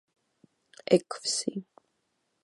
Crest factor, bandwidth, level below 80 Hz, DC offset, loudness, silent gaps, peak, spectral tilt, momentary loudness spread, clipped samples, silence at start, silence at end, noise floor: 24 dB; 11.5 kHz; -82 dBFS; under 0.1%; -28 LUFS; none; -8 dBFS; -4 dB/octave; 16 LU; under 0.1%; 0.9 s; 0.8 s; -77 dBFS